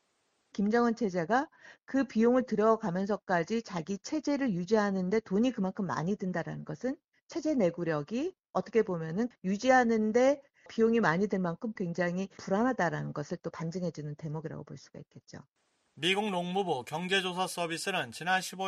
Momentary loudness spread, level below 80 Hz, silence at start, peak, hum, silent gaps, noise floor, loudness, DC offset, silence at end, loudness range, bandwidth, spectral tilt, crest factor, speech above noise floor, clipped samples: 12 LU; -68 dBFS; 0.55 s; -12 dBFS; none; 7.04-7.12 s, 7.21-7.27 s; -76 dBFS; -31 LUFS; under 0.1%; 0 s; 6 LU; 13 kHz; -5.5 dB/octave; 20 dB; 45 dB; under 0.1%